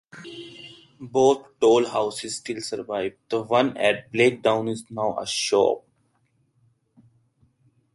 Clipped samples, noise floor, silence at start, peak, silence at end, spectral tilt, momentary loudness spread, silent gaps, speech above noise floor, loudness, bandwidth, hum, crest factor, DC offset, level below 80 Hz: under 0.1%; -67 dBFS; 0.15 s; -6 dBFS; 2.15 s; -4 dB/octave; 20 LU; none; 45 dB; -23 LUFS; 11.5 kHz; none; 18 dB; under 0.1%; -66 dBFS